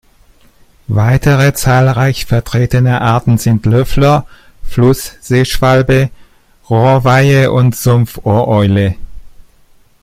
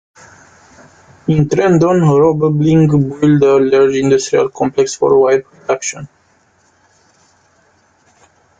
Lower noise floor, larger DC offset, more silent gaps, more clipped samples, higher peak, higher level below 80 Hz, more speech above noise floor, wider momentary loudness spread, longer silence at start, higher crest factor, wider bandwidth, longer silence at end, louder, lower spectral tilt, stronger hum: second, -45 dBFS vs -54 dBFS; neither; neither; neither; about the same, 0 dBFS vs 0 dBFS; first, -28 dBFS vs -48 dBFS; second, 36 dB vs 43 dB; about the same, 6 LU vs 8 LU; second, 0.9 s vs 1.25 s; about the same, 12 dB vs 14 dB; first, 15.5 kHz vs 9.2 kHz; second, 0.6 s vs 2.55 s; about the same, -11 LUFS vs -12 LUFS; about the same, -6.5 dB/octave vs -6.5 dB/octave; neither